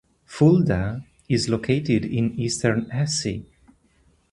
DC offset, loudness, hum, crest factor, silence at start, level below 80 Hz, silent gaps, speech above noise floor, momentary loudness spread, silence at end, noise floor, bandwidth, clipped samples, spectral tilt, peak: under 0.1%; -22 LUFS; none; 18 dB; 0.3 s; -46 dBFS; none; 40 dB; 12 LU; 0.9 s; -61 dBFS; 11.5 kHz; under 0.1%; -5.5 dB/octave; -4 dBFS